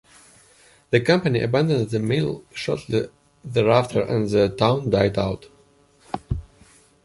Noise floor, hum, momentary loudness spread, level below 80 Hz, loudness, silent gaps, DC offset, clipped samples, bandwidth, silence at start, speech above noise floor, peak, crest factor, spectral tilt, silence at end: -57 dBFS; none; 13 LU; -46 dBFS; -22 LUFS; none; under 0.1%; under 0.1%; 11.5 kHz; 0.9 s; 36 dB; -2 dBFS; 20 dB; -7 dB/octave; 0.6 s